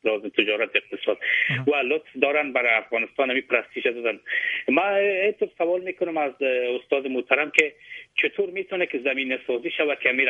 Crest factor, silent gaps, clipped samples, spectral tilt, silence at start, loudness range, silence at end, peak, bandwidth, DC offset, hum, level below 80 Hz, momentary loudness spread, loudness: 24 dB; none; under 0.1%; -4.5 dB/octave; 0.05 s; 1 LU; 0 s; 0 dBFS; 8.4 kHz; under 0.1%; none; -74 dBFS; 6 LU; -23 LUFS